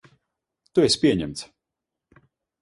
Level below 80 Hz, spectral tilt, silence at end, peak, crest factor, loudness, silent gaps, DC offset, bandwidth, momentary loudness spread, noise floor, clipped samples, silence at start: -54 dBFS; -4.5 dB/octave; 1.15 s; -6 dBFS; 20 dB; -22 LUFS; none; under 0.1%; 11.5 kHz; 18 LU; -85 dBFS; under 0.1%; 0.75 s